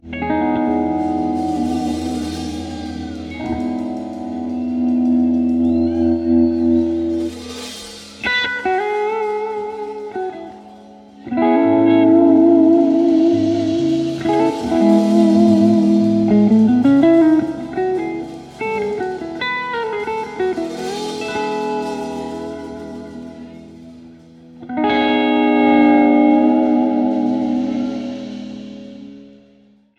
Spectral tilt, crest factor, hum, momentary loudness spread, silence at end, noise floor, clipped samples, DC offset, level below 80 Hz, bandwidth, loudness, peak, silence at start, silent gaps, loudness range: -6.5 dB/octave; 16 dB; none; 17 LU; 0.7 s; -51 dBFS; under 0.1%; under 0.1%; -46 dBFS; 11 kHz; -16 LUFS; -2 dBFS; 0.05 s; none; 10 LU